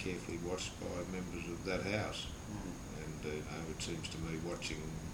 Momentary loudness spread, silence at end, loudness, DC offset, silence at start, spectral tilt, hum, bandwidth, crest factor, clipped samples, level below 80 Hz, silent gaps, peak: 7 LU; 0 s; -42 LUFS; under 0.1%; 0 s; -4.5 dB/octave; none; 20 kHz; 20 dB; under 0.1%; -54 dBFS; none; -22 dBFS